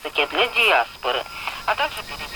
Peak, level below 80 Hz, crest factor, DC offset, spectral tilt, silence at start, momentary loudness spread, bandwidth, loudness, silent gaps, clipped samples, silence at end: -6 dBFS; -50 dBFS; 16 dB; under 0.1%; -1.5 dB/octave; 0 s; 11 LU; 17.5 kHz; -21 LUFS; none; under 0.1%; 0 s